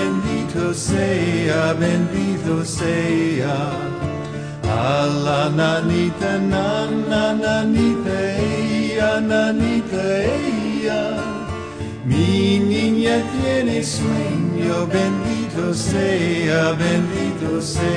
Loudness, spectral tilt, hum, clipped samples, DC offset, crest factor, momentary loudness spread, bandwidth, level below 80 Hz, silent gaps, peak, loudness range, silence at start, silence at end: -19 LUFS; -6 dB/octave; none; under 0.1%; 0.1%; 14 dB; 5 LU; 10.5 kHz; -42 dBFS; none; -6 dBFS; 2 LU; 0 s; 0 s